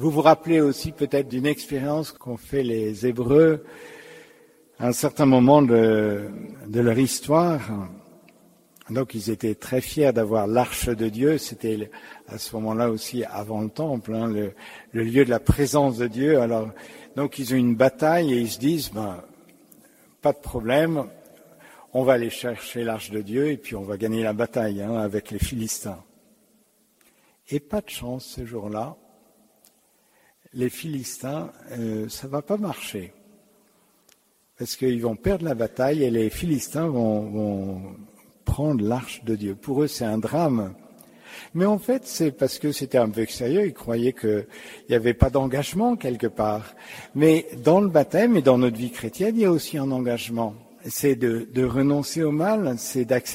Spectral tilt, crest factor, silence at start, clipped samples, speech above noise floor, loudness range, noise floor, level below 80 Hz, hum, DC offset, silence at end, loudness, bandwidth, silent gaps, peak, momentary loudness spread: -6 dB/octave; 22 dB; 0 s; under 0.1%; 40 dB; 11 LU; -62 dBFS; -44 dBFS; none; under 0.1%; 0 s; -23 LUFS; 16 kHz; none; -2 dBFS; 14 LU